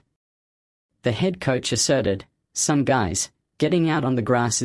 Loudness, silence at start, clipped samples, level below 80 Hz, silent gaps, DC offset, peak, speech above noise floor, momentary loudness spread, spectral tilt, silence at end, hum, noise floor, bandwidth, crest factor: -22 LUFS; 1.05 s; under 0.1%; -54 dBFS; none; under 0.1%; -6 dBFS; over 69 dB; 8 LU; -4.5 dB/octave; 0 s; none; under -90 dBFS; 12 kHz; 16 dB